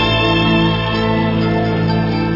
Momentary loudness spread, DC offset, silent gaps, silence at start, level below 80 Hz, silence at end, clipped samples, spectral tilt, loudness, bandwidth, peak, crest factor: 3 LU; under 0.1%; none; 0 s; -30 dBFS; 0 s; under 0.1%; -7.5 dB/octave; -15 LUFS; 5.8 kHz; -2 dBFS; 12 dB